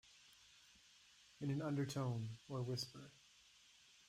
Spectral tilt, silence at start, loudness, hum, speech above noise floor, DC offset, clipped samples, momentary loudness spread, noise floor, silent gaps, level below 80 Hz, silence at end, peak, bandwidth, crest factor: -6 dB/octave; 0.05 s; -45 LUFS; none; 25 dB; under 0.1%; under 0.1%; 23 LU; -69 dBFS; none; -78 dBFS; 0.9 s; -32 dBFS; 15.5 kHz; 14 dB